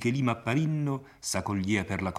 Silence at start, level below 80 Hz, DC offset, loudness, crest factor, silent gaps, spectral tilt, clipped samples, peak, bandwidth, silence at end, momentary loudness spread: 0 s; -62 dBFS; under 0.1%; -29 LUFS; 18 dB; none; -5.5 dB/octave; under 0.1%; -12 dBFS; 15 kHz; 0 s; 5 LU